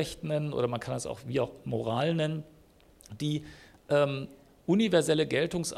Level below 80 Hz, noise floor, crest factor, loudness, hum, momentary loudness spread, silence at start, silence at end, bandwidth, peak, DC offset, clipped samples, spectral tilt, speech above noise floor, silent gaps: -60 dBFS; -58 dBFS; 18 dB; -30 LUFS; none; 14 LU; 0 s; 0 s; 14.5 kHz; -12 dBFS; under 0.1%; under 0.1%; -5.5 dB/octave; 29 dB; none